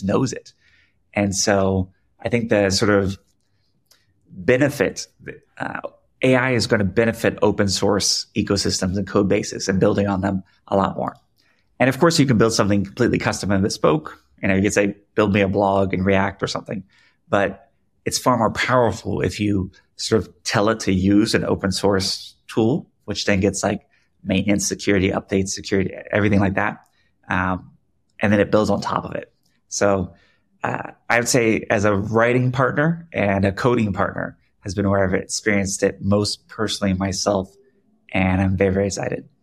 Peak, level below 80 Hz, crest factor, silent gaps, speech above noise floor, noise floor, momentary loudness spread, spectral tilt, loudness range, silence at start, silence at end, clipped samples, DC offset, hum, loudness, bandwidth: -2 dBFS; -50 dBFS; 18 dB; none; 48 dB; -67 dBFS; 12 LU; -5 dB/octave; 3 LU; 0 s; 0.2 s; under 0.1%; under 0.1%; none; -20 LUFS; 15 kHz